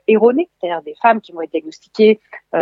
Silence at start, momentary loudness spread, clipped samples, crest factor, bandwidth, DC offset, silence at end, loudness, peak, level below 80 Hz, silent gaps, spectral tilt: 0.1 s; 11 LU; under 0.1%; 14 dB; 7.4 kHz; under 0.1%; 0 s; -17 LUFS; 0 dBFS; -76 dBFS; none; -7 dB/octave